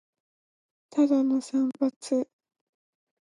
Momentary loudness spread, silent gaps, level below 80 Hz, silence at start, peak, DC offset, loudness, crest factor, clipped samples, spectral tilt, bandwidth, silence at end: 8 LU; 1.96-2.01 s; -86 dBFS; 0.95 s; -14 dBFS; under 0.1%; -26 LUFS; 16 dB; under 0.1%; -5 dB/octave; 11 kHz; 1 s